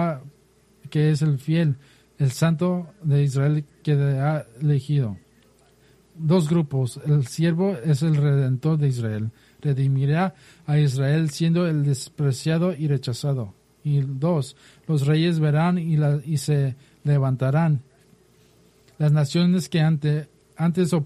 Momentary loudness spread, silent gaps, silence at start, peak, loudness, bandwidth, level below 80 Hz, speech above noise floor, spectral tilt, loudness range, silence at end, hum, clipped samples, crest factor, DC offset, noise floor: 8 LU; none; 0 s; -10 dBFS; -23 LUFS; 12.5 kHz; -60 dBFS; 37 dB; -7.5 dB/octave; 2 LU; 0 s; none; under 0.1%; 12 dB; under 0.1%; -58 dBFS